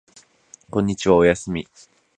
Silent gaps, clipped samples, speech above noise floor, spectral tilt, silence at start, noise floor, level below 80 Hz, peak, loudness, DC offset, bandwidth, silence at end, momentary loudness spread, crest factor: none; under 0.1%; 32 dB; -6 dB/octave; 0.75 s; -51 dBFS; -46 dBFS; -2 dBFS; -20 LUFS; under 0.1%; 9.8 kHz; 0.55 s; 14 LU; 20 dB